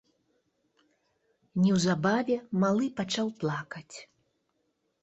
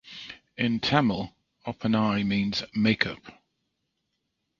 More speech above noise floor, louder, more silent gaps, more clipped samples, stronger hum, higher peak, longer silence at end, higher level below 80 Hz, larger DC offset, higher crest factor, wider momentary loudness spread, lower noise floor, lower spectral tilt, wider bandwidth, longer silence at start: second, 49 dB vs 53 dB; about the same, -28 LUFS vs -26 LUFS; neither; neither; neither; second, -12 dBFS vs -2 dBFS; second, 1 s vs 1.3 s; second, -68 dBFS vs -56 dBFS; neither; second, 18 dB vs 26 dB; about the same, 17 LU vs 17 LU; about the same, -77 dBFS vs -79 dBFS; about the same, -5.5 dB/octave vs -6 dB/octave; first, 8.2 kHz vs 7.2 kHz; first, 1.55 s vs 0.05 s